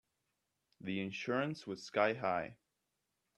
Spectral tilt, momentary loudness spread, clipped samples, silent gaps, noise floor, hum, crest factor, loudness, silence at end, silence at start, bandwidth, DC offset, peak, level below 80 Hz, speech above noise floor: -5.5 dB/octave; 12 LU; under 0.1%; none; -86 dBFS; none; 24 dB; -38 LUFS; 0.85 s; 0.8 s; 12 kHz; under 0.1%; -16 dBFS; -80 dBFS; 48 dB